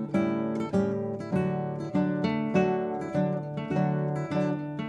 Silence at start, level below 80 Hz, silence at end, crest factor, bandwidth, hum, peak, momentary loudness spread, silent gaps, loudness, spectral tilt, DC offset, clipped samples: 0 s; -64 dBFS; 0 s; 16 dB; 8.8 kHz; none; -12 dBFS; 4 LU; none; -29 LUFS; -8.5 dB/octave; under 0.1%; under 0.1%